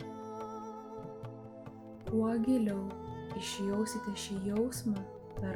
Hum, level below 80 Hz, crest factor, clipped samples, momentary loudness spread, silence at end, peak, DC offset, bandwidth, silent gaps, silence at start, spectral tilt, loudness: none; -60 dBFS; 16 dB; under 0.1%; 16 LU; 0 s; -20 dBFS; under 0.1%; 18 kHz; none; 0 s; -5.5 dB/octave; -36 LUFS